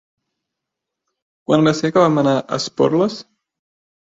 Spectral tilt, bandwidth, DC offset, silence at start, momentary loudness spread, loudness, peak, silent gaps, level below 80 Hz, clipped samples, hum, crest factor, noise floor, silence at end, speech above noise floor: -6 dB/octave; 7.8 kHz; under 0.1%; 1.5 s; 9 LU; -17 LUFS; -2 dBFS; none; -58 dBFS; under 0.1%; none; 18 dB; -82 dBFS; 0.85 s; 66 dB